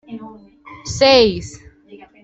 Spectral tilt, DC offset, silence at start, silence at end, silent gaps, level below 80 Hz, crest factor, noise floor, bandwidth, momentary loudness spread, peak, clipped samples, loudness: -4 dB/octave; under 0.1%; 0.1 s; 0.25 s; none; -44 dBFS; 18 dB; -44 dBFS; 8.2 kHz; 23 LU; -2 dBFS; under 0.1%; -13 LUFS